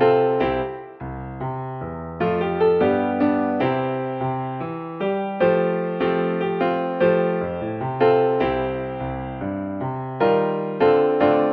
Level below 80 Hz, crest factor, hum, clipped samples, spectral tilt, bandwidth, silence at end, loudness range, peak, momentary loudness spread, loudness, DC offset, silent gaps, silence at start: -48 dBFS; 16 dB; none; under 0.1%; -10 dB/octave; 5 kHz; 0 s; 2 LU; -4 dBFS; 12 LU; -22 LUFS; under 0.1%; none; 0 s